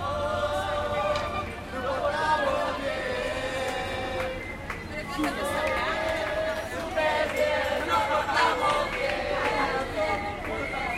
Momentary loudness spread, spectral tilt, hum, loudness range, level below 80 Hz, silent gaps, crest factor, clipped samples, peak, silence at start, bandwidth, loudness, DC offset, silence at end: 7 LU; -4 dB/octave; none; 4 LU; -44 dBFS; none; 18 dB; under 0.1%; -10 dBFS; 0 s; 16.5 kHz; -28 LUFS; under 0.1%; 0 s